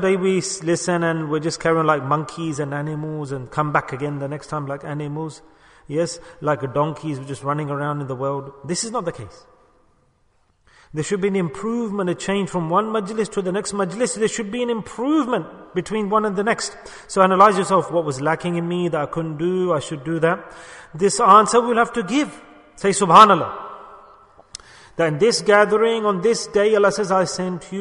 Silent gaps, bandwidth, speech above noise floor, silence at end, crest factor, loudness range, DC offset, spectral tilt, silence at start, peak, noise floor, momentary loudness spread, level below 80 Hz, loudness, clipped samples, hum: none; 10.5 kHz; 42 dB; 0 s; 20 dB; 10 LU; under 0.1%; -5 dB/octave; 0 s; 0 dBFS; -61 dBFS; 14 LU; -56 dBFS; -20 LUFS; under 0.1%; none